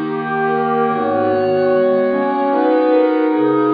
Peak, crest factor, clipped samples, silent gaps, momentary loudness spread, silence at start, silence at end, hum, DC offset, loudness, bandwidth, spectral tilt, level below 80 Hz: -4 dBFS; 12 dB; under 0.1%; none; 3 LU; 0 s; 0 s; none; under 0.1%; -16 LUFS; 5 kHz; -9.5 dB/octave; -66 dBFS